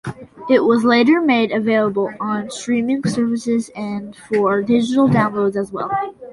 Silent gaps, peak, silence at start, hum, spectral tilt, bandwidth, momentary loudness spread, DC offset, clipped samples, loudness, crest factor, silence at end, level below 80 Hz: none; -2 dBFS; 0.05 s; none; -6 dB/octave; 11.5 kHz; 10 LU; under 0.1%; under 0.1%; -17 LUFS; 16 dB; 0 s; -56 dBFS